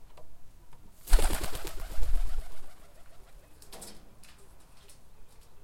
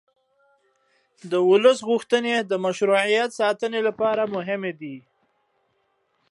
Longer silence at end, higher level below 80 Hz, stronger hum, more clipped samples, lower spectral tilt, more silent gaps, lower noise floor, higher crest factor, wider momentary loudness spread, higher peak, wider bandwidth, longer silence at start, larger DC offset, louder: second, 0.05 s vs 1.3 s; first, -34 dBFS vs -76 dBFS; neither; neither; about the same, -3.5 dB/octave vs -4.5 dB/octave; neither; second, -50 dBFS vs -70 dBFS; about the same, 22 dB vs 18 dB; first, 27 LU vs 12 LU; about the same, -6 dBFS vs -6 dBFS; first, 16.5 kHz vs 11.5 kHz; second, 0 s vs 1.25 s; neither; second, -36 LUFS vs -22 LUFS